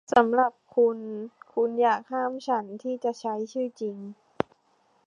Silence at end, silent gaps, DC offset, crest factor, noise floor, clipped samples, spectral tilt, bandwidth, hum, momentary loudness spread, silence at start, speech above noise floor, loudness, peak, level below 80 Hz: 0.95 s; none; under 0.1%; 22 dB; -66 dBFS; under 0.1%; -5.5 dB/octave; 7.6 kHz; none; 12 LU; 0.1 s; 41 dB; -27 LUFS; -4 dBFS; -68 dBFS